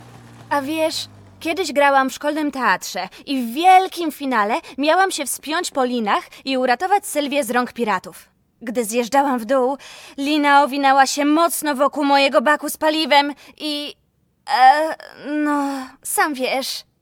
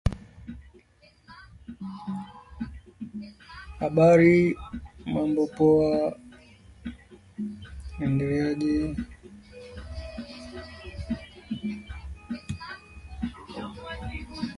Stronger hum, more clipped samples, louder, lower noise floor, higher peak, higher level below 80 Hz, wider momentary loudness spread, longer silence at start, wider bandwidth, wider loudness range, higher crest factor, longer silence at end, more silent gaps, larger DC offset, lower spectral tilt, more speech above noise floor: neither; neither; first, -18 LUFS vs -26 LUFS; second, -42 dBFS vs -59 dBFS; first, -2 dBFS vs -8 dBFS; second, -64 dBFS vs -44 dBFS; second, 12 LU vs 23 LU; about the same, 0 s vs 0.05 s; first, 19.5 kHz vs 11.5 kHz; second, 4 LU vs 15 LU; second, 16 dB vs 22 dB; first, 0.2 s vs 0 s; neither; neither; second, -2.5 dB/octave vs -8 dB/octave; second, 23 dB vs 35 dB